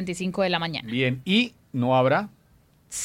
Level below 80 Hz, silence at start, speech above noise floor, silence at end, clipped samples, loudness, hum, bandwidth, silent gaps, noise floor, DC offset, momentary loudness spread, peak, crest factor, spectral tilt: -62 dBFS; 0 s; 35 dB; 0 s; under 0.1%; -24 LUFS; none; 16 kHz; none; -59 dBFS; under 0.1%; 8 LU; -8 dBFS; 18 dB; -5 dB/octave